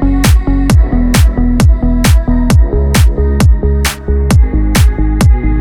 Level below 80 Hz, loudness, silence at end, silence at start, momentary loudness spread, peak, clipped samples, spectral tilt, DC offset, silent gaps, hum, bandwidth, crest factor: -10 dBFS; -11 LUFS; 0 s; 0 s; 2 LU; 0 dBFS; under 0.1%; -6 dB/octave; under 0.1%; none; none; 18.5 kHz; 8 dB